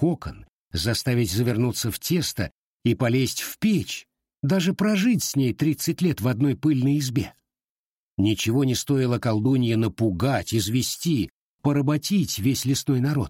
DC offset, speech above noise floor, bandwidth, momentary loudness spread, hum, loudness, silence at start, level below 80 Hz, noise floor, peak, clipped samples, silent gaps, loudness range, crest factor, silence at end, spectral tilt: under 0.1%; over 67 dB; 16.5 kHz; 7 LU; none; -24 LUFS; 0 s; -50 dBFS; under -90 dBFS; -8 dBFS; under 0.1%; 0.49-0.71 s, 2.51-2.80 s, 7.64-8.17 s, 11.30-11.59 s; 2 LU; 14 dB; 0 s; -5.5 dB/octave